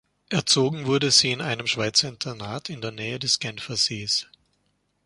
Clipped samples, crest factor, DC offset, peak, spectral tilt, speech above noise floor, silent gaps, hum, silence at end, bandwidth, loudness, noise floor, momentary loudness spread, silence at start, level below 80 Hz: under 0.1%; 22 dB; under 0.1%; -4 dBFS; -2.5 dB/octave; 46 dB; none; 50 Hz at -60 dBFS; 0.8 s; 11.5 kHz; -23 LUFS; -71 dBFS; 14 LU; 0.3 s; -62 dBFS